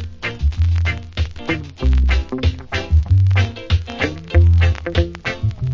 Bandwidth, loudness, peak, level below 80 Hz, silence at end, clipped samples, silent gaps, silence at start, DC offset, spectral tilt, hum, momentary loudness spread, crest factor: 7.2 kHz; -19 LUFS; -2 dBFS; -20 dBFS; 0 s; under 0.1%; none; 0 s; under 0.1%; -7 dB/octave; none; 10 LU; 14 dB